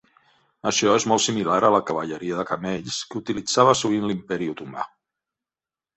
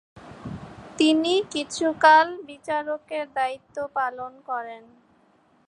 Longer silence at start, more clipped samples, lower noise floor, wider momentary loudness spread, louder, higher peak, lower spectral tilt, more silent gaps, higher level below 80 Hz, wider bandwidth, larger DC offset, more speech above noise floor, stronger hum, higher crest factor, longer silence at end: first, 0.65 s vs 0.15 s; neither; first, under -90 dBFS vs -61 dBFS; second, 12 LU vs 22 LU; about the same, -22 LUFS vs -23 LUFS; about the same, -4 dBFS vs -4 dBFS; about the same, -3.5 dB/octave vs -3.5 dB/octave; neither; about the same, -60 dBFS vs -62 dBFS; second, 8.4 kHz vs 11 kHz; neither; first, over 68 dB vs 38 dB; neither; about the same, 20 dB vs 22 dB; first, 1.1 s vs 0.9 s